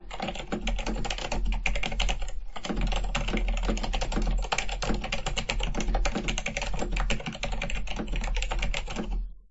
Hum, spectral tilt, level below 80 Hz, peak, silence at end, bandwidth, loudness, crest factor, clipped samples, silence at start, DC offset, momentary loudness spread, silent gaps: none; -4 dB/octave; -30 dBFS; -10 dBFS; 0.1 s; 8.2 kHz; -32 LUFS; 20 dB; under 0.1%; 0 s; under 0.1%; 5 LU; none